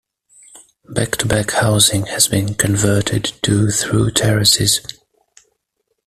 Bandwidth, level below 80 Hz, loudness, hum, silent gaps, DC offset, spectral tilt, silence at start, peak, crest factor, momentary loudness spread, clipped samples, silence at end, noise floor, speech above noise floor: 15 kHz; -42 dBFS; -15 LUFS; none; none; under 0.1%; -3.5 dB/octave; 0.55 s; 0 dBFS; 18 dB; 7 LU; under 0.1%; 1.15 s; -71 dBFS; 55 dB